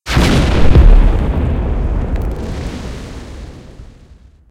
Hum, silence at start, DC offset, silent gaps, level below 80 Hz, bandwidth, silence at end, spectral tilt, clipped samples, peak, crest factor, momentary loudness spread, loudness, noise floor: none; 0.05 s; under 0.1%; none; -14 dBFS; 11.5 kHz; 0.65 s; -6.5 dB/octave; 0.5%; 0 dBFS; 12 dB; 21 LU; -15 LUFS; -42 dBFS